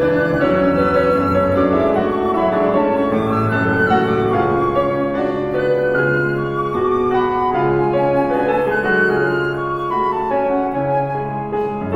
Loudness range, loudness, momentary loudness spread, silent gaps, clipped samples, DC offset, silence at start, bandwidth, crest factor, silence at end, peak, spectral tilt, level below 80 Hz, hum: 2 LU; -17 LUFS; 5 LU; none; under 0.1%; under 0.1%; 0 s; 12 kHz; 14 dB; 0 s; -2 dBFS; -8.5 dB/octave; -42 dBFS; none